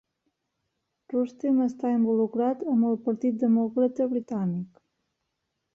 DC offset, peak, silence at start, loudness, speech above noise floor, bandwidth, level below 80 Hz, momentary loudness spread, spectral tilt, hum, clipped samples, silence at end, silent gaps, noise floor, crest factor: under 0.1%; -14 dBFS; 1.1 s; -26 LUFS; 55 dB; 6.8 kHz; -72 dBFS; 6 LU; -10 dB/octave; none; under 0.1%; 1.1 s; none; -80 dBFS; 14 dB